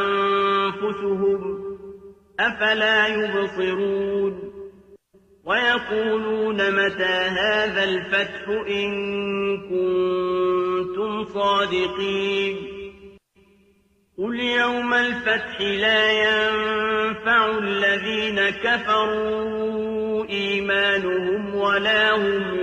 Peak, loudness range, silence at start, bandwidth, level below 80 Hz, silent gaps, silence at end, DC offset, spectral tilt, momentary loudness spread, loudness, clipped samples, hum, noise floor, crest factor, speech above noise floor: -8 dBFS; 5 LU; 0 s; 8.4 kHz; -56 dBFS; none; 0 s; under 0.1%; -4.5 dB/octave; 8 LU; -21 LUFS; under 0.1%; none; -61 dBFS; 14 dB; 39 dB